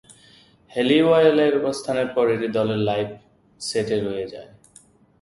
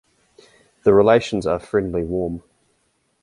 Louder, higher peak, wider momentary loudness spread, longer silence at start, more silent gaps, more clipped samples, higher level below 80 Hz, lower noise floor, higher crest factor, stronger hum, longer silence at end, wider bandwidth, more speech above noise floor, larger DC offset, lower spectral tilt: about the same, -21 LUFS vs -19 LUFS; about the same, -4 dBFS vs -2 dBFS; first, 16 LU vs 12 LU; second, 0.1 s vs 0.85 s; neither; neither; second, -58 dBFS vs -46 dBFS; second, -53 dBFS vs -67 dBFS; about the same, 18 dB vs 18 dB; neither; about the same, 0.75 s vs 0.85 s; about the same, 11.5 kHz vs 11 kHz; second, 33 dB vs 49 dB; neither; about the same, -5.5 dB/octave vs -6.5 dB/octave